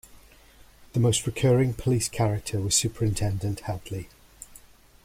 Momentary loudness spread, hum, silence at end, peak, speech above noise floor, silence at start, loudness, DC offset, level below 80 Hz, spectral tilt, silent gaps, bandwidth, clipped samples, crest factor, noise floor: 23 LU; none; 0.45 s; -10 dBFS; 28 dB; 0.8 s; -25 LUFS; under 0.1%; -46 dBFS; -5 dB/octave; none; 16 kHz; under 0.1%; 18 dB; -53 dBFS